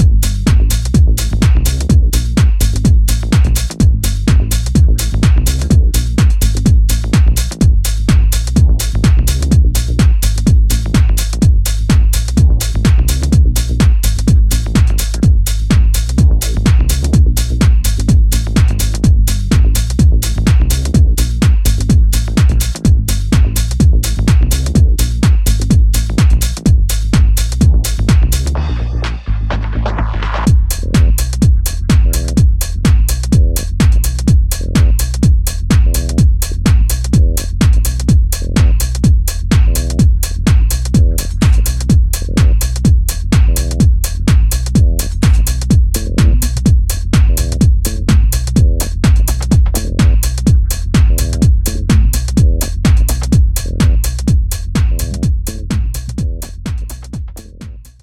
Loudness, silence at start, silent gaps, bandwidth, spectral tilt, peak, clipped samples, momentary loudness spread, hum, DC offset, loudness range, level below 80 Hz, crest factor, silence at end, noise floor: -13 LUFS; 0 s; none; 16.5 kHz; -5.5 dB/octave; 0 dBFS; under 0.1%; 4 LU; none; under 0.1%; 2 LU; -12 dBFS; 10 dB; 0.2 s; -31 dBFS